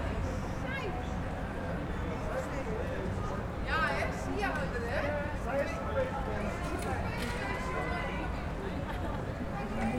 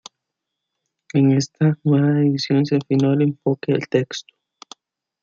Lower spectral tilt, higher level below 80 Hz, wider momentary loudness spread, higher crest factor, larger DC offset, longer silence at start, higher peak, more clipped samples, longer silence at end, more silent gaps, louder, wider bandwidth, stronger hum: about the same, -6 dB/octave vs -7 dB/octave; first, -42 dBFS vs -66 dBFS; about the same, 4 LU vs 6 LU; about the same, 16 dB vs 16 dB; neither; second, 0 s vs 1.15 s; second, -18 dBFS vs -4 dBFS; neither; second, 0 s vs 1 s; neither; second, -35 LUFS vs -19 LUFS; first, 17 kHz vs 7.4 kHz; neither